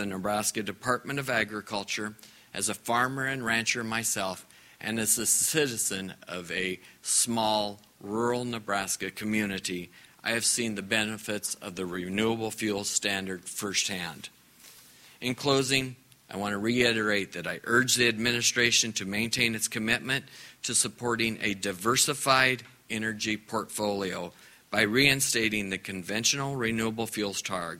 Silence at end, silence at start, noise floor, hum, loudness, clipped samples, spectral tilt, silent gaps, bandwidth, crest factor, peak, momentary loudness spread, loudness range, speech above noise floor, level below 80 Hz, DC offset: 0 s; 0 s; -54 dBFS; none; -28 LUFS; under 0.1%; -2.5 dB/octave; none; 16 kHz; 24 dB; -6 dBFS; 12 LU; 5 LU; 25 dB; -62 dBFS; under 0.1%